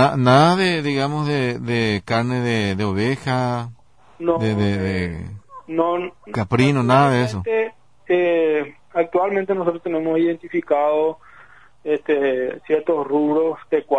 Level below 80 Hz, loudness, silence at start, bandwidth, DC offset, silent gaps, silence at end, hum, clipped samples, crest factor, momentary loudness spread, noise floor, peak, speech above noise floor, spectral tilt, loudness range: -52 dBFS; -20 LUFS; 0 s; 10.5 kHz; 0.3%; none; 0 s; none; under 0.1%; 16 dB; 11 LU; -48 dBFS; -2 dBFS; 30 dB; -7 dB/octave; 4 LU